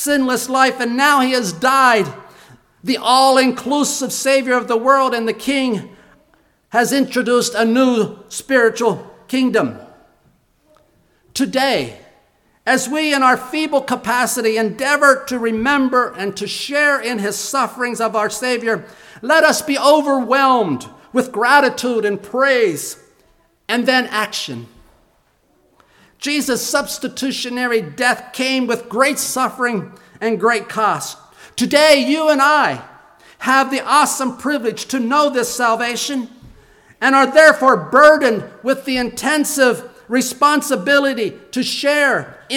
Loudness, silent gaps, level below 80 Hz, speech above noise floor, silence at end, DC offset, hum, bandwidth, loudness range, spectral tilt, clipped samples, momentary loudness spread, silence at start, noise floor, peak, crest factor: -16 LUFS; none; -58 dBFS; 43 dB; 0 s; under 0.1%; none; 18.5 kHz; 7 LU; -3 dB/octave; under 0.1%; 10 LU; 0 s; -58 dBFS; 0 dBFS; 16 dB